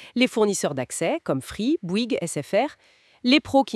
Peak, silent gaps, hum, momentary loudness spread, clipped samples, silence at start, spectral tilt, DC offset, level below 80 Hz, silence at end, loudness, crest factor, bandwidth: -6 dBFS; none; none; 7 LU; under 0.1%; 0 s; -4 dB/octave; under 0.1%; -60 dBFS; 0 s; -24 LUFS; 18 dB; 12 kHz